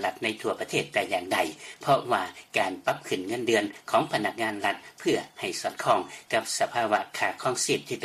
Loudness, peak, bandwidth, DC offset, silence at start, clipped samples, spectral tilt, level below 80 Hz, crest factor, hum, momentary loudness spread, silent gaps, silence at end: -28 LUFS; -10 dBFS; 15 kHz; under 0.1%; 0 s; under 0.1%; -3 dB/octave; -70 dBFS; 18 dB; none; 6 LU; none; 0 s